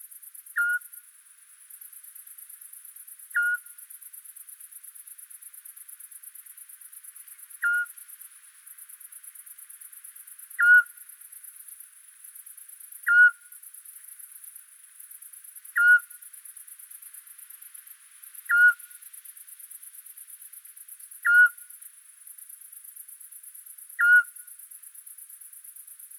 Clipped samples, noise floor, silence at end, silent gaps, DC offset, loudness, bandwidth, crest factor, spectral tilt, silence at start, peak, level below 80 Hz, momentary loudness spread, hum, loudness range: under 0.1%; -54 dBFS; 1.95 s; none; under 0.1%; -21 LUFS; over 20 kHz; 20 dB; 10.5 dB/octave; 0.55 s; -10 dBFS; under -90 dBFS; 26 LU; none; 10 LU